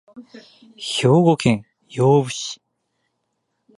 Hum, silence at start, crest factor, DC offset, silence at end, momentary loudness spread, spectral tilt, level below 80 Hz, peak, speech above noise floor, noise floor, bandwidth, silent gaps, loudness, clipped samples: none; 0.15 s; 18 dB; under 0.1%; 1.25 s; 17 LU; -6 dB/octave; -56 dBFS; -4 dBFS; 55 dB; -74 dBFS; 11.5 kHz; none; -18 LUFS; under 0.1%